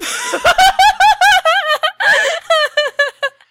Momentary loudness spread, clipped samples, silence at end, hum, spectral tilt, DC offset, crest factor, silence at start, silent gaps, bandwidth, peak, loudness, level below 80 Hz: 7 LU; under 0.1%; 0.2 s; none; 0 dB/octave; under 0.1%; 10 dB; 0 s; none; 16 kHz; -2 dBFS; -12 LUFS; -42 dBFS